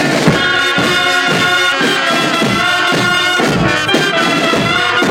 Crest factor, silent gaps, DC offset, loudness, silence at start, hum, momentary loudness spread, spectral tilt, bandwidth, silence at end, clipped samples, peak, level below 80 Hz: 12 dB; none; under 0.1%; -11 LUFS; 0 s; none; 1 LU; -3.5 dB/octave; 18 kHz; 0 s; under 0.1%; 0 dBFS; -40 dBFS